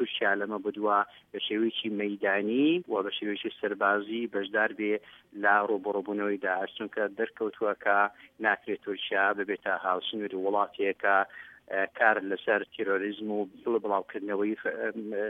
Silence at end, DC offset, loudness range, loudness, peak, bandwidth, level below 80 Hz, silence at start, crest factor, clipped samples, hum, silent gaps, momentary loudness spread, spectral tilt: 0 s; under 0.1%; 1 LU; -29 LUFS; -8 dBFS; 4 kHz; -78 dBFS; 0 s; 22 dB; under 0.1%; none; none; 8 LU; -7 dB/octave